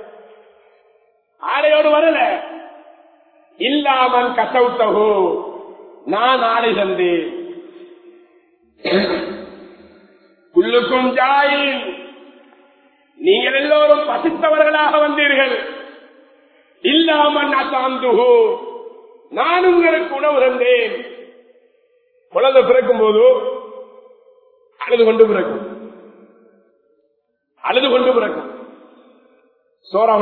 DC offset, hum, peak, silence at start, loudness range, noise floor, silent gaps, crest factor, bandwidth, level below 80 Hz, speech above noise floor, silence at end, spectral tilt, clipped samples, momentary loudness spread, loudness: under 0.1%; none; 0 dBFS; 0 s; 6 LU; -67 dBFS; none; 18 dB; 4.5 kHz; -60 dBFS; 53 dB; 0 s; -7.5 dB/octave; under 0.1%; 18 LU; -15 LUFS